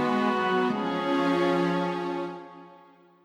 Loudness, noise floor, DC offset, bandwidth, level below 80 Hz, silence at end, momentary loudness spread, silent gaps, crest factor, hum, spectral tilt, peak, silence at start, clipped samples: -26 LUFS; -55 dBFS; under 0.1%; 11.5 kHz; -68 dBFS; 0.5 s; 12 LU; none; 14 dB; none; -6.5 dB/octave; -14 dBFS; 0 s; under 0.1%